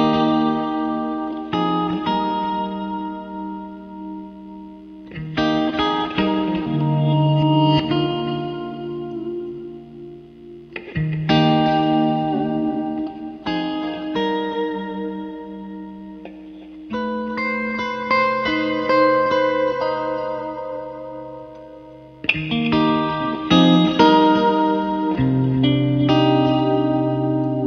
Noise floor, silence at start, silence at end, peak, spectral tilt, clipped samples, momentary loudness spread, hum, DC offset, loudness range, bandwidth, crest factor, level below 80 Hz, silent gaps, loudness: -41 dBFS; 0 s; 0 s; -2 dBFS; -7.5 dB/octave; under 0.1%; 20 LU; none; under 0.1%; 10 LU; 6.6 kHz; 18 dB; -50 dBFS; none; -20 LUFS